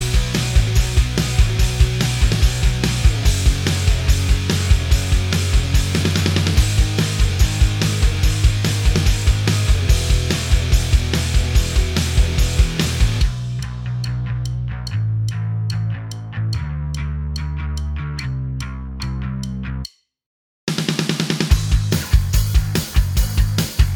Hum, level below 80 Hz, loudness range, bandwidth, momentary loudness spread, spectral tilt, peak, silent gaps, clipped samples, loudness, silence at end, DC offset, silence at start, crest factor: none; -20 dBFS; 8 LU; 18.5 kHz; 8 LU; -4.5 dB/octave; -2 dBFS; 20.26-20.67 s; under 0.1%; -19 LUFS; 0 s; under 0.1%; 0 s; 16 dB